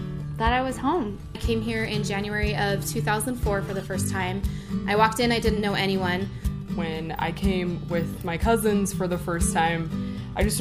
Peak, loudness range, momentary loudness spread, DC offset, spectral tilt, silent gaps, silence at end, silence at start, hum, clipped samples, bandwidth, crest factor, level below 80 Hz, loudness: -6 dBFS; 2 LU; 8 LU; under 0.1%; -5 dB/octave; none; 0 s; 0 s; none; under 0.1%; 15.5 kHz; 20 dB; -36 dBFS; -26 LUFS